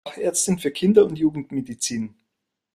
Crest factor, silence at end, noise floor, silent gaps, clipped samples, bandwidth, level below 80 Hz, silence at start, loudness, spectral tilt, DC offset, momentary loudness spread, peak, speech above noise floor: 20 dB; 0.65 s; -80 dBFS; none; under 0.1%; 15 kHz; -60 dBFS; 0.05 s; -22 LUFS; -4.5 dB/octave; under 0.1%; 13 LU; -2 dBFS; 59 dB